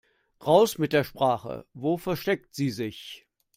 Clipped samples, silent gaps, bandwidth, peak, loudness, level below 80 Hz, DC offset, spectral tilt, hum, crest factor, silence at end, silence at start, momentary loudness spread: under 0.1%; none; 16 kHz; -6 dBFS; -26 LUFS; -62 dBFS; under 0.1%; -5.5 dB/octave; none; 20 dB; 0.4 s; 0.4 s; 18 LU